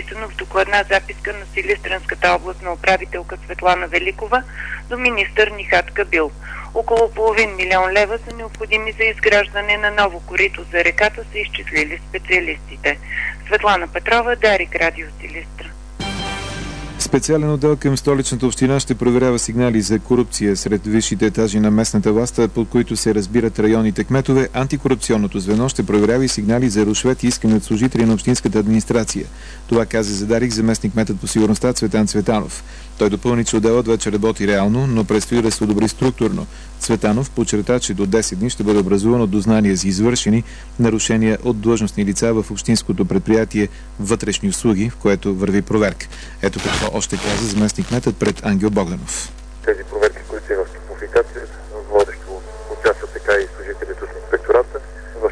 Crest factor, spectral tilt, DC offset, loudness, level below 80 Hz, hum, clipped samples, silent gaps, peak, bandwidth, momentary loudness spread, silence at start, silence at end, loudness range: 16 dB; -5 dB/octave; 0.4%; -17 LUFS; -34 dBFS; none; under 0.1%; none; 0 dBFS; 11 kHz; 11 LU; 0 s; 0 s; 4 LU